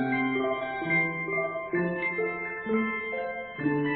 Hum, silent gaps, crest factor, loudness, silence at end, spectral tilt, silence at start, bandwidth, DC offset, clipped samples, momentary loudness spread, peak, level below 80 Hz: none; none; 14 dB; -29 LUFS; 0 s; -10 dB/octave; 0 s; 4.5 kHz; under 0.1%; under 0.1%; 6 LU; -16 dBFS; -62 dBFS